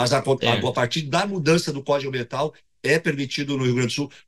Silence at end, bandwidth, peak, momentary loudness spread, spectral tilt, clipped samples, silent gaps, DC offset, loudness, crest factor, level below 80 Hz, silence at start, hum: 0.2 s; 15.5 kHz; -2 dBFS; 7 LU; -5 dB/octave; under 0.1%; none; 0.2%; -23 LUFS; 20 dB; -58 dBFS; 0 s; none